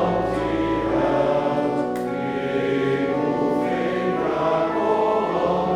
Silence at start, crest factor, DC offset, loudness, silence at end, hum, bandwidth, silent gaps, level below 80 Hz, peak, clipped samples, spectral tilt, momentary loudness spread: 0 s; 14 dB; under 0.1%; -22 LUFS; 0 s; none; 13.5 kHz; none; -46 dBFS; -8 dBFS; under 0.1%; -7 dB/octave; 4 LU